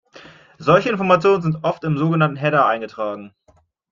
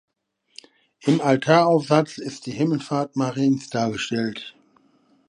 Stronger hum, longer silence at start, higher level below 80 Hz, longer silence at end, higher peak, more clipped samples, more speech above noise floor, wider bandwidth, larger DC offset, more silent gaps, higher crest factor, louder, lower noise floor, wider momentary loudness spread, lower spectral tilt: neither; second, 0.15 s vs 1.05 s; first, -58 dBFS vs -66 dBFS; second, 0.65 s vs 0.8 s; about the same, -2 dBFS vs -2 dBFS; neither; second, 40 dB vs 45 dB; second, 7.2 kHz vs 10.5 kHz; neither; neither; about the same, 18 dB vs 22 dB; first, -18 LUFS vs -22 LUFS; second, -58 dBFS vs -66 dBFS; about the same, 11 LU vs 13 LU; first, -7.5 dB/octave vs -6 dB/octave